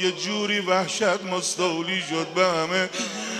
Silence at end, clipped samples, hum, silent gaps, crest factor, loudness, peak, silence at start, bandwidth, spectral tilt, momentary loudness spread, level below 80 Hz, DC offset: 0 s; under 0.1%; none; none; 18 dB; -24 LUFS; -6 dBFS; 0 s; 14 kHz; -3 dB/octave; 4 LU; -74 dBFS; under 0.1%